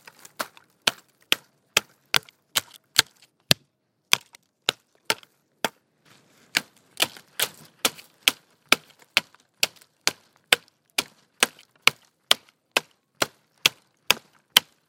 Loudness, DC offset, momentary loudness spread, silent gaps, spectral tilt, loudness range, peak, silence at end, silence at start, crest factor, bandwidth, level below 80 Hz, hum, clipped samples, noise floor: -25 LUFS; under 0.1%; 7 LU; none; 0 dB/octave; 4 LU; 0 dBFS; 0.3 s; 0.4 s; 28 dB; 17 kHz; -68 dBFS; none; under 0.1%; -70 dBFS